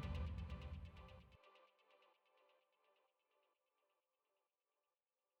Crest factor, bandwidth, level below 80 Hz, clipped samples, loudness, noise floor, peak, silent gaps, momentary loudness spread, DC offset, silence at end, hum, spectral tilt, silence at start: 20 dB; 8 kHz; -60 dBFS; under 0.1%; -52 LUFS; under -90 dBFS; -36 dBFS; none; 19 LU; under 0.1%; 3.35 s; none; -7.5 dB/octave; 0 s